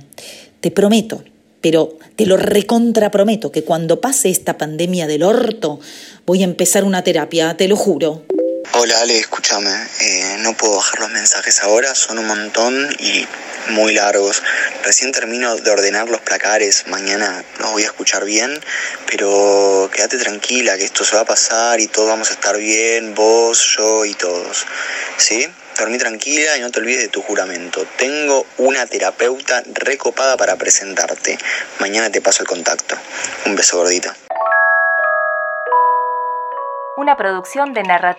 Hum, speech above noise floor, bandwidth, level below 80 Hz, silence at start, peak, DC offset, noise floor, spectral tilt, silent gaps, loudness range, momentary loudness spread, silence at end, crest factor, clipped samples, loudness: none; 21 dB; 16.5 kHz; -64 dBFS; 0.2 s; 0 dBFS; under 0.1%; -37 dBFS; -2 dB/octave; none; 3 LU; 8 LU; 0 s; 16 dB; under 0.1%; -14 LUFS